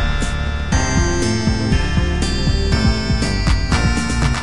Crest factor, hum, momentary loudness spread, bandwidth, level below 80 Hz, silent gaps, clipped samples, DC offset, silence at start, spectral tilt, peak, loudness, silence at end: 14 dB; none; 3 LU; 11.5 kHz; -20 dBFS; none; under 0.1%; 3%; 0 s; -5 dB/octave; -2 dBFS; -18 LUFS; 0 s